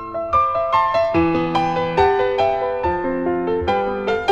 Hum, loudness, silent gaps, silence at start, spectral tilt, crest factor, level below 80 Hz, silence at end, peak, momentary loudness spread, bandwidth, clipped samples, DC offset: none; -19 LUFS; none; 0 s; -7 dB/octave; 14 dB; -40 dBFS; 0 s; -4 dBFS; 4 LU; 8 kHz; under 0.1%; under 0.1%